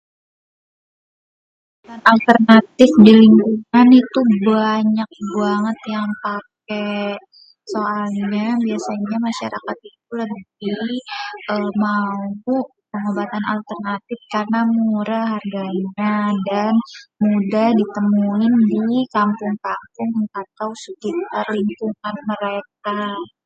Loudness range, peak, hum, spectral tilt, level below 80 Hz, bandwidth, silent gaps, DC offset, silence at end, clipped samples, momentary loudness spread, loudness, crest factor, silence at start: 12 LU; 0 dBFS; none; -7 dB/octave; -62 dBFS; 7.8 kHz; none; under 0.1%; 0.2 s; under 0.1%; 16 LU; -17 LUFS; 18 dB; 1.9 s